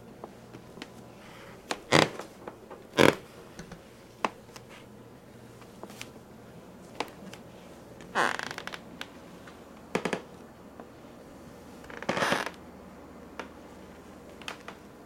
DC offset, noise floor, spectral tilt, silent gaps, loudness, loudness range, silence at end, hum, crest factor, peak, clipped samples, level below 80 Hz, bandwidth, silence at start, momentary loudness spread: under 0.1%; -51 dBFS; -4 dB/octave; none; -31 LUFS; 13 LU; 0 s; none; 34 dB; 0 dBFS; under 0.1%; -64 dBFS; 16.5 kHz; 0 s; 23 LU